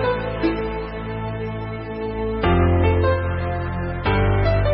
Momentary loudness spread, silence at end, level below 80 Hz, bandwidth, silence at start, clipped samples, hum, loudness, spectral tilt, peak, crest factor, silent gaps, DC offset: 11 LU; 0 s; -30 dBFS; 5.6 kHz; 0 s; under 0.1%; none; -22 LUFS; -12 dB/octave; -6 dBFS; 14 dB; none; under 0.1%